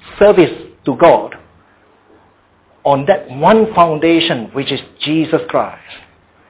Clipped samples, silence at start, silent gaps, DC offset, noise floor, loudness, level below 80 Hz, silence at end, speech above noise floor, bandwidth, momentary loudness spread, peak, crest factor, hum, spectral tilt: under 0.1%; 0.05 s; none; under 0.1%; -51 dBFS; -13 LUFS; -46 dBFS; 0.5 s; 39 dB; 4 kHz; 11 LU; 0 dBFS; 14 dB; none; -10 dB/octave